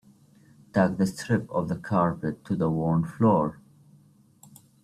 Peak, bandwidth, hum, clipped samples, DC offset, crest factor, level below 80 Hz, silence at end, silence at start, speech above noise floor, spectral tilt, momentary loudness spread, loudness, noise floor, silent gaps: -8 dBFS; 14 kHz; none; under 0.1%; under 0.1%; 18 dB; -58 dBFS; 1.3 s; 0.75 s; 33 dB; -8 dB/octave; 7 LU; -26 LUFS; -58 dBFS; none